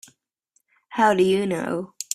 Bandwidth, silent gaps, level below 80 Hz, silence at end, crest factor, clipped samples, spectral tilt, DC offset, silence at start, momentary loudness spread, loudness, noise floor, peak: 14.5 kHz; none; -64 dBFS; 0 s; 20 dB; under 0.1%; -4.5 dB/octave; under 0.1%; 0.9 s; 12 LU; -22 LUFS; -70 dBFS; -4 dBFS